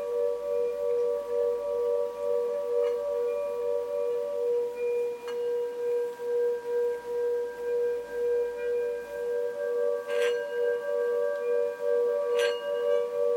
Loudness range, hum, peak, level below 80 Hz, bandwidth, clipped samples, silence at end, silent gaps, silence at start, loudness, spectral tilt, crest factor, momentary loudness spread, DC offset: 2 LU; none; -14 dBFS; -68 dBFS; 16.5 kHz; under 0.1%; 0 s; none; 0 s; -29 LUFS; -2.5 dB/octave; 14 dB; 4 LU; under 0.1%